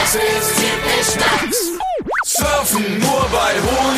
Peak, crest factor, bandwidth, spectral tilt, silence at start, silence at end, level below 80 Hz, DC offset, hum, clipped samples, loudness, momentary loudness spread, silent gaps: -2 dBFS; 16 dB; 15.5 kHz; -2.5 dB/octave; 0 s; 0 s; -36 dBFS; under 0.1%; none; under 0.1%; -16 LUFS; 4 LU; none